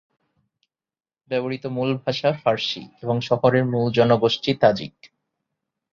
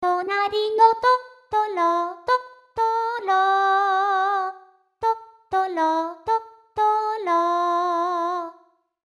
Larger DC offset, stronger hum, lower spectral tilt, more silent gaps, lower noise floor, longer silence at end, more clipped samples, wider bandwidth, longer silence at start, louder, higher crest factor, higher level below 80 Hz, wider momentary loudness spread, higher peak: neither; neither; first, -6.5 dB/octave vs -3.5 dB/octave; neither; first, under -90 dBFS vs -57 dBFS; first, 0.85 s vs 0.55 s; neither; second, 7.2 kHz vs 12 kHz; first, 1.3 s vs 0 s; about the same, -21 LUFS vs -22 LUFS; about the same, 20 dB vs 18 dB; about the same, -60 dBFS vs -64 dBFS; about the same, 10 LU vs 8 LU; about the same, -2 dBFS vs -4 dBFS